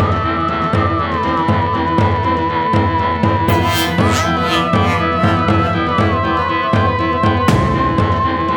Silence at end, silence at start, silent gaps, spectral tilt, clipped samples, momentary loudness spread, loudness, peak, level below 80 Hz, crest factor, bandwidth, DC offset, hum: 0 s; 0 s; none; -6 dB/octave; under 0.1%; 2 LU; -15 LUFS; 0 dBFS; -32 dBFS; 14 dB; 19 kHz; under 0.1%; none